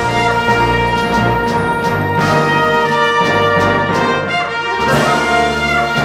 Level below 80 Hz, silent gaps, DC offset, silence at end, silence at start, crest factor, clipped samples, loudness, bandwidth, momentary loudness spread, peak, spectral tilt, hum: -34 dBFS; none; 0.1%; 0 s; 0 s; 12 dB; under 0.1%; -13 LUFS; 16.5 kHz; 3 LU; 0 dBFS; -5 dB/octave; none